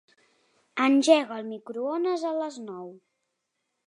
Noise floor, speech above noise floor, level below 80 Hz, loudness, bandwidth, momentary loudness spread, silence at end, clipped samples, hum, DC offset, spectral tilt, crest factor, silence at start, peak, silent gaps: -80 dBFS; 55 dB; -86 dBFS; -25 LUFS; 11 kHz; 19 LU; 0.9 s; under 0.1%; none; under 0.1%; -3.5 dB/octave; 22 dB; 0.75 s; -6 dBFS; none